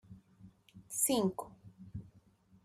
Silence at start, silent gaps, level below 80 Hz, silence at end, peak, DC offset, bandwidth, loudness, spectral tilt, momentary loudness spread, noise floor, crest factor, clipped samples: 0.1 s; none; -66 dBFS; 0.6 s; -18 dBFS; under 0.1%; 14.5 kHz; -34 LUFS; -4 dB/octave; 24 LU; -65 dBFS; 22 dB; under 0.1%